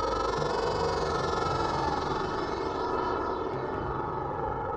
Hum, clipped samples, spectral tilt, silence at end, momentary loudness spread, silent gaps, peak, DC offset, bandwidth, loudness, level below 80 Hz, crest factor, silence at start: none; under 0.1%; -5.5 dB/octave; 0 s; 4 LU; none; -14 dBFS; under 0.1%; 10 kHz; -30 LUFS; -44 dBFS; 16 dB; 0 s